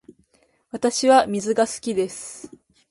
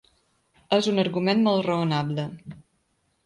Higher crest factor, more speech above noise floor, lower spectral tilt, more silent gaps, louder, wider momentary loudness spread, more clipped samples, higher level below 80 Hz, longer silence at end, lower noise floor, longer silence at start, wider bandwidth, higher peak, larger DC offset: about the same, 20 dB vs 18 dB; second, 43 dB vs 47 dB; second, -3.5 dB/octave vs -6.5 dB/octave; neither; first, -21 LUFS vs -24 LUFS; first, 20 LU vs 14 LU; neither; about the same, -64 dBFS vs -64 dBFS; second, 0.45 s vs 0.65 s; second, -63 dBFS vs -71 dBFS; about the same, 0.75 s vs 0.7 s; about the same, 11.5 kHz vs 11 kHz; first, -4 dBFS vs -8 dBFS; neither